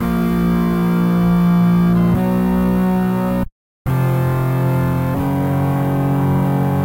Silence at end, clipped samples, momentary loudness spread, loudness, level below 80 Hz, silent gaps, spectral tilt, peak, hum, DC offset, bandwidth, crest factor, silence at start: 0 s; under 0.1%; 5 LU; -16 LUFS; -34 dBFS; 3.52-3.85 s; -9 dB/octave; -6 dBFS; none; under 0.1%; 16 kHz; 10 dB; 0 s